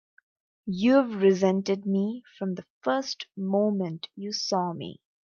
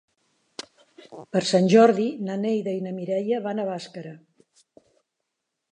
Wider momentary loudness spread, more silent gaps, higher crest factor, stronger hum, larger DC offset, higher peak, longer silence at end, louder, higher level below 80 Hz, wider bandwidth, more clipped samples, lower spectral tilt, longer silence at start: second, 13 LU vs 24 LU; first, 2.70-2.81 s vs none; about the same, 16 dB vs 20 dB; neither; neither; second, -10 dBFS vs -4 dBFS; second, 0.3 s vs 1.6 s; second, -27 LUFS vs -23 LUFS; first, -70 dBFS vs -76 dBFS; second, 7.2 kHz vs 10 kHz; neither; about the same, -6 dB/octave vs -6 dB/octave; second, 0.65 s vs 1.1 s